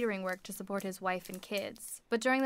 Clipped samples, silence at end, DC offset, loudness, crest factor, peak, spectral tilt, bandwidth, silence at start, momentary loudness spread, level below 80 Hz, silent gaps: under 0.1%; 0 s; under 0.1%; -37 LUFS; 16 dB; -18 dBFS; -4 dB/octave; 16 kHz; 0 s; 8 LU; -70 dBFS; none